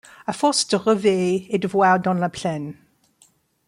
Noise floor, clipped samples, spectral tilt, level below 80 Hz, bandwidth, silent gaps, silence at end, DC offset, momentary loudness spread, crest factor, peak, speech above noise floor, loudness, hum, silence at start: -59 dBFS; under 0.1%; -4.5 dB/octave; -64 dBFS; 12.5 kHz; none; 0.95 s; under 0.1%; 11 LU; 16 dB; -6 dBFS; 39 dB; -20 LUFS; none; 0.3 s